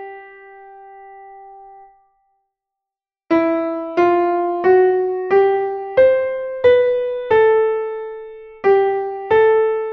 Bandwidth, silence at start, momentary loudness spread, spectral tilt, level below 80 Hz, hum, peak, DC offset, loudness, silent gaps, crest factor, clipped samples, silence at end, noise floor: 5.8 kHz; 0 s; 10 LU; -7.5 dB/octave; -56 dBFS; none; -2 dBFS; under 0.1%; -16 LUFS; none; 14 dB; under 0.1%; 0 s; -88 dBFS